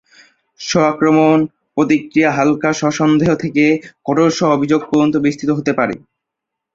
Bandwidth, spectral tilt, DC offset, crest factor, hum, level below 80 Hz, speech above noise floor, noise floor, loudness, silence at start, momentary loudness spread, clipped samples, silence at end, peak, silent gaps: 7.6 kHz; -6 dB/octave; under 0.1%; 14 dB; none; -52 dBFS; 66 dB; -80 dBFS; -15 LUFS; 0.6 s; 7 LU; under 0.1%; 0.75 s; -2 dBFS; none